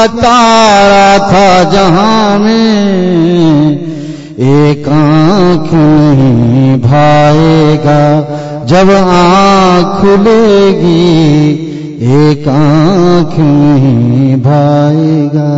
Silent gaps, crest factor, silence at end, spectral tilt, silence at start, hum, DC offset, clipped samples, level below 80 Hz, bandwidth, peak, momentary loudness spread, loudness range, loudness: none; 6 dB; 0 s; -7 dB/octave; 0 s; none; under 0.1%; 0.1%; -32 dBFS; 8 kHz; 0 dBFS; 5 LU; 2 LU; -6 LUFS